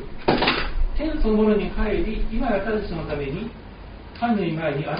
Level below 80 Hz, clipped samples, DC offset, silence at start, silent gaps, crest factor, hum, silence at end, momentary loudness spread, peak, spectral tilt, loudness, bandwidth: -28 dBFS; under 0.1%; under 0.1%; 0 s; none; 18 dB; none; 0 s; 14 LU; -6 dBFS; -4.5 dB/octave; -24 LUFS; 5.2 kHz